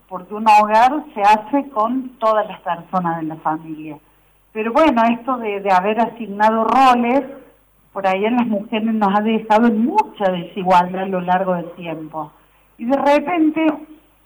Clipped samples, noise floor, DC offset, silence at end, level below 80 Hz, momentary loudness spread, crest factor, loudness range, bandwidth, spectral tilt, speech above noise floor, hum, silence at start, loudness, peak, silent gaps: under 0.1%; -52 dBFS; under 0.1%; 0.3 s; -54 dBFS; 16 LU; 12 dB; 4 LU; over 20 kHz; -6.5 dB/octave; 35 dB; none; 0.1 s; -17 LUFS; -6 dBFS; none